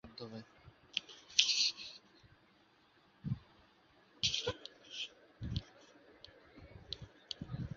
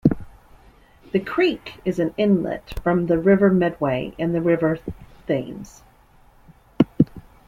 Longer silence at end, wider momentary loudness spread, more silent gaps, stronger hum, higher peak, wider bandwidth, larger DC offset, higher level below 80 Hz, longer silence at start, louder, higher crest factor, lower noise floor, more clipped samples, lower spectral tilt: second, 0 s vs 0.25 s; first, 27 LU vs 13 LU; neither; neither; second, -8 dBFS vs 0 dBFS; second, 7.4 kHz vs 13.5 kHz; neither; second, -60 dBFS vs -44 dBFS; about the same, 0.05 s vs 0.05 s; second, -38 LUFS vs -21 LUFS; first, 34 dB vs 22 dB; first, -69 dBFS vs -53 dBFS; neither; second, -2 dB/octave vs -8 dB/octave